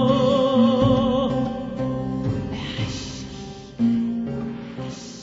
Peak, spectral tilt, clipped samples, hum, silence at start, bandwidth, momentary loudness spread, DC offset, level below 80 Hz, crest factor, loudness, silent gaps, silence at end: -6 dBFS; -7 dB/octave; under 0.1%; none; 0 s; 7.8 kHz; 16 LU; under 0.1%; -44 dBFS; 16 dB; -23 LUFS; none; 0 s